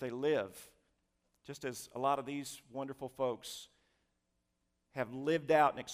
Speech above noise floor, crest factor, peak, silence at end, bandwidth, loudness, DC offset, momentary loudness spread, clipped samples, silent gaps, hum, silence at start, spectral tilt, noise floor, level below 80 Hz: 46 dB; 22 dB; -16 dBFS; 0 s; 15.5 kHz; -36 LUFS; under 0.1%; 17 LU; under 0.1%; none; none; 0 s; -4.5 dB/octave; -82 dBFS; -76 dBFS